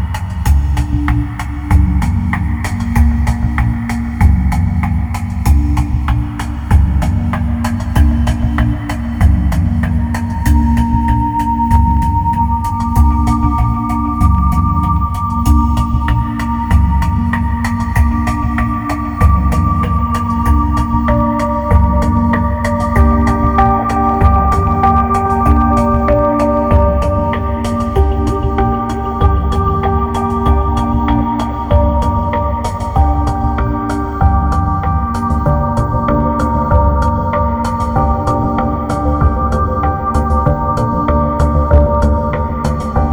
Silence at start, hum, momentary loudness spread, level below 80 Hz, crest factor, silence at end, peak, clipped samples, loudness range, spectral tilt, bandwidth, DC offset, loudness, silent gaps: 0 s; none; 5 LU; -16 dBFS; 12 dB; 0 s; 0 dBFS; under 0.1%; 3 LU; -8 dB/octave; 16.5 kHz; under 0.1%; -14 LUFS; none